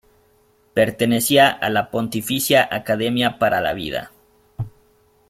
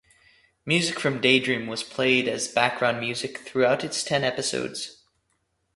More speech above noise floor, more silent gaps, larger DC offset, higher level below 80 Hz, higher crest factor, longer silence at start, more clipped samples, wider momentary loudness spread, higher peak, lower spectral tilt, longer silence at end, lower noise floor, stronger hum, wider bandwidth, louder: second, 39 dB vs 48 dB; neither; neither; first, -52 dBFS vs -64 dBFS; about the same, 20 dB vs 22 dB; about the same, 0.75 s vs 0.65 s; neither; first, 15 LU vs 11 LU; about the same, -2 dBFS vs -4 dBFS; about the same, -4 dB/octave vs -3.5 dB/octave; second, 0.6 s vs 0.85 s; second, -58 dBFS vs -73 dBFS; neither; first, 16.5 kHz vs 11.5 kHz; first, -19 LUFS vs -24 LUFS